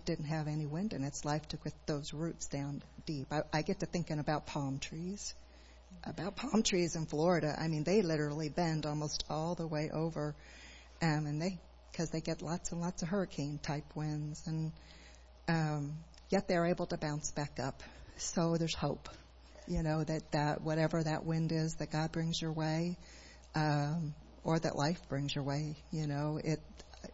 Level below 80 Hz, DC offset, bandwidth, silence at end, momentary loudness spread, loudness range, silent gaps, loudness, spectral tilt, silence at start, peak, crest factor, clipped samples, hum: -56 dBFS; under 0.1%; 7.6 kHz; 0 s; 12 LU; 5 LU; none; -37 LUFS; -5.5 dB/octave; 0 s; -18 dBFS; 18 dB; under 0.1%; none